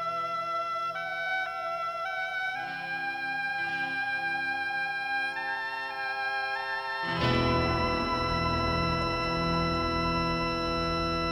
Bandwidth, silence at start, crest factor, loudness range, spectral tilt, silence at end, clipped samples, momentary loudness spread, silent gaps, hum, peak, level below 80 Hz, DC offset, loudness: 18.5 kHz; 0 s; 16 dB; 4 LU; -5.5 dB/octave; 0 s; under 0.1%; 5 LU; none; none; -14 dBFS; -46 dBFS; under 0.1%; -29 LUFS